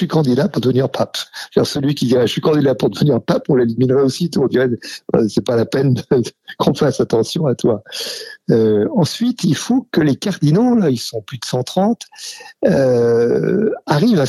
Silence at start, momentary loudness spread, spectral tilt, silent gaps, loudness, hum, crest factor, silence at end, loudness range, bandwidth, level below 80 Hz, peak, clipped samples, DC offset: 0 s; 8 LU; -6.5 dB/octave; none; -16 LUFS; none; 16 dB; 0 s; 1 LU; 13.5 kHz; -52 dBFS; 0 dBFS; under 0.1%; under 0.1%